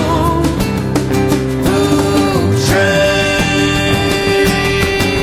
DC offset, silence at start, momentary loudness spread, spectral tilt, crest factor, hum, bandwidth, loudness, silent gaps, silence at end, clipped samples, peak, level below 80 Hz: under 0.1%; 0 s; 3 LU; -5 dB/octave; 12 dB; none; 16 kHz; -13 LUFS; none; 0 s; under 0.1%; -2 dBFS; -26 dBFS